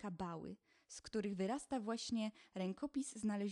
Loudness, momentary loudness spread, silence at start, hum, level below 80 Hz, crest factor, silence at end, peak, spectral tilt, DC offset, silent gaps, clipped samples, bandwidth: -44 LUFS; 13 LU; 0 s; none; -74 dBFS; 14 dB; 0 s; -28 dBFS; -5 dB/octave; under 0.1%; none; under 0.1%; 11.5 kHz